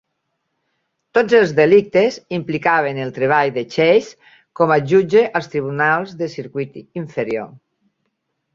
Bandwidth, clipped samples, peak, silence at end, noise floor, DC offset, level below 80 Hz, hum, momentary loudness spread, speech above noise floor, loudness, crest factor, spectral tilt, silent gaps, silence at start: 7.4 kHz; under 0.1%; -2 dBFS; 1 s; -73 dBFS; under 0.1%; -60 dBFS; none; 14 LU; 57 dB; -17 LUFS; 16 dB; -6.5 dB/octave; none; 1.15 s